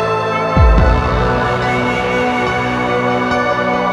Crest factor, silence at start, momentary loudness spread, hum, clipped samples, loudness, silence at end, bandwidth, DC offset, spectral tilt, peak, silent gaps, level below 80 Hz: 14 dB; 0 s; 4 LU; none; under 0.1%; -14 LUFS; 0 s; 10.5 kHz; under 0.1%; -6.5 dB/octave; 0 dBFS; none; -20 dBFS